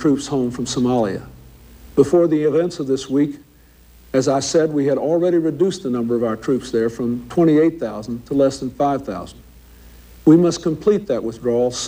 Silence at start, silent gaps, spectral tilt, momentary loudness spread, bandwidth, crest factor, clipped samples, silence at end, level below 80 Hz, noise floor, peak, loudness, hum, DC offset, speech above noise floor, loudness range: 0 s; none; -6 dB/octave; 9 LU; 16 kHz; 18 dB; under 0.1%; 0 s; -48 dBFS; -48 dBFS; -2 dBFS; -19 LUFS; none; under 0.1%; 31 dB; 1 LU